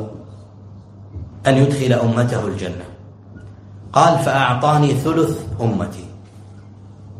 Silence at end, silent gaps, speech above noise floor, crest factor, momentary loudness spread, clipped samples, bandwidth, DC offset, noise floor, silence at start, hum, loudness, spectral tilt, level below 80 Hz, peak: 0 s; none; 23 dB; 20 dB; 23 LU; under 0.1%; 15 kHz; under 0.1%; -39 dBFS; 0 s; none; -17 LUFS; -6.5 dB/octave; -46 dBFS; 0 dBFS